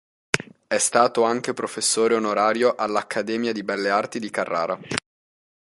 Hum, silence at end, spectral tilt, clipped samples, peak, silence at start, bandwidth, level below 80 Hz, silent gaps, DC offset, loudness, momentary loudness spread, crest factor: none; 0.7 s; -2.5 dB/octave; under 0.1%; -2 dBFS; 0.35 s; 12 kHz; -64 dBFS; none; under 0.1%; -23 LUFS; 8 LU; 22 dB